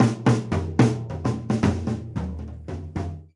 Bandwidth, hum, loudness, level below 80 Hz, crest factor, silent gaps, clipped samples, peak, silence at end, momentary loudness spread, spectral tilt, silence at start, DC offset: 11 kHz; none; -25 LUFS; -44 dBFS; 20 dB; none; under 0.1%; -4 dBFS; 0.1 s; 12 LU; -7.5 dB/octave; 0 s; under 0.1%